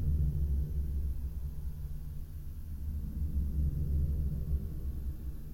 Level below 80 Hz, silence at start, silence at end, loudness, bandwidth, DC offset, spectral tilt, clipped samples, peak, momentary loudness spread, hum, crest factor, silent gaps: -34 dBFS; 0 s; 0 s; -37 LUFS; 16.5 kHz; under 0.1%; -9.5 dB/octave; under 0.1%; -20 dBFS; 11 LU; none; 12 dB; none